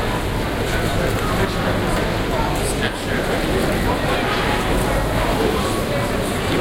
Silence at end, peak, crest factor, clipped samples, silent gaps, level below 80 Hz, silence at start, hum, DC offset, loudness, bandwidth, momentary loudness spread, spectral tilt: 0 s; -4 dBFS; 14 dB; under 0.1%; none; -28 dBFS; 0 s; none; under 0.1%; -20 LUFS; 17 kHz; 2 LU; -5 dB/octave